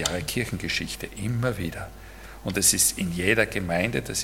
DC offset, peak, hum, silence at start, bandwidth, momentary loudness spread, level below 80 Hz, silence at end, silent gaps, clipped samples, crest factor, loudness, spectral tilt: under 0.1%; -4 dBFS; none; 0 s; 17.5 kHz; 16 LU; -44 dBFS; 0 s; none; under 0.1%; 22 dB; -24 LUFS; -3 dB/octave